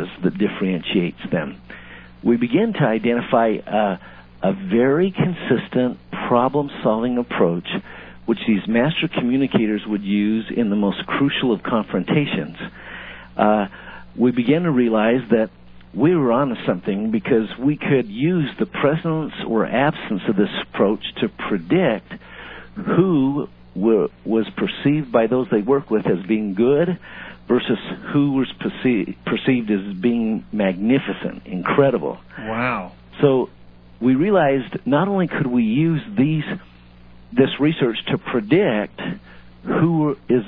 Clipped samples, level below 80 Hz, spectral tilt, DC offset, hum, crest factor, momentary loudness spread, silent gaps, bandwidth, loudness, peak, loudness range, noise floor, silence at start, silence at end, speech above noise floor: under 0.1%; -50 dBFS; -11 dB/octave; under 0.1%; none; 18 dB; 11 LU; none; 4.8 kHz; -20 LUFS; -2 dBFS; 2 LU; -44 dBFS; 0 s; 0 s; 25 dB